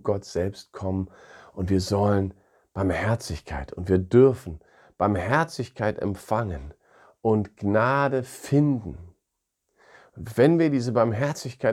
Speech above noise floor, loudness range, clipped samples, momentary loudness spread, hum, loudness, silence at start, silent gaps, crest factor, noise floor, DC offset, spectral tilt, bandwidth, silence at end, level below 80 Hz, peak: 57 dB; 3 LU; under 0.1%; 14 LU; none; -25 LUFS; 0.05 s; none; 20 dB; -80 dBFS; under 0.1%; -7 dB/octave; 15.5 kHz; 0 s; -48 dBFS; -6 dBFS